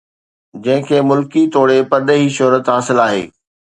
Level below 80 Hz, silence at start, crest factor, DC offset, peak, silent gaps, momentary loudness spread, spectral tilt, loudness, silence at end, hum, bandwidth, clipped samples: -60 dBFS; 0.55 s; 14 dB; under 0.1%; 0 dBFS; none; 6 LU; -5.5 dB/octave; -13 LUFS; 0.45 s; none; 11 kHz; under 0.1%